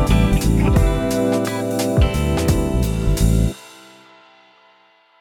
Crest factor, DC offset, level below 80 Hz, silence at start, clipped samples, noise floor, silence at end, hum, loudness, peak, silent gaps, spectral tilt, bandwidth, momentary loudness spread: 14 dB; under 0.1%; -22 dBFS; 0 s; under 0.1%; -54 dBFS; 1.55 s; none; -18 LUFS; -4 dBFS; none; -6.5 dB/octave; 18 kHz; 4 LU